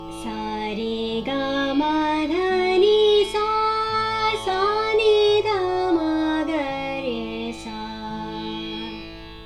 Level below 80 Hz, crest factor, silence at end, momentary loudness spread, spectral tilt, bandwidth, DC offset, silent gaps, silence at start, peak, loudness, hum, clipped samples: -46 dBFS; 16 dB; 0 s; 14 LU; -4.5 dB/octave; 11.5 kHz; under 0.1%; none; 0 s; -6 dBFS; -22 LUFS; 50 Hz at -45 dBFS; under 0.1%